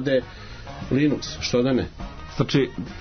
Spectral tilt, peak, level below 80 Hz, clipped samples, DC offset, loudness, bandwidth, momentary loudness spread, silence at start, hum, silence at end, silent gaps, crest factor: -6 dB/octave; -8 dBFS; -42 dBFS; under 0.1%; under 0.1%; -24 LUFS; 6.6 kHz; 17 LU; 0 s; none; 0 s; none; 16 dB